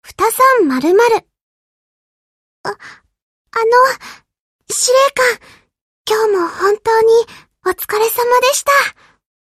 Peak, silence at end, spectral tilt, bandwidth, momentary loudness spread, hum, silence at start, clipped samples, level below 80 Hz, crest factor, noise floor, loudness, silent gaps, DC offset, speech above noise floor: 0 dBFS; 0.7 s; -1.5 dB/octave; 15 kHz; 15 LU; none; 0.1 s; under 0.1%; -56 dBFS; 14 dB; -40 dBFS; -13 LUFS; 1.41-2.64 s, 3.22-3.45 s, 4.39-4.59 s, 5.81-6.05 s; under 0.1%; 28 dB